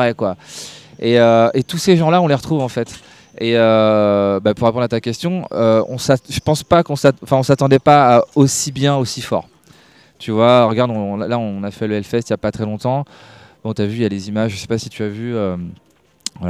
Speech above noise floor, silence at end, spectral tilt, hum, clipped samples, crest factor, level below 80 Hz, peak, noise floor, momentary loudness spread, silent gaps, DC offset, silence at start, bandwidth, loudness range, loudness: 32 dB; 0 s; -5.5 dB/octave; none; under 0.1%; 16 dB; -50 dBFS; 0 dBFS; -48 dBFS; 13 LU; none; under 0.1%; 0 s; 15.5 kHz; 8 LU; -16 LUFS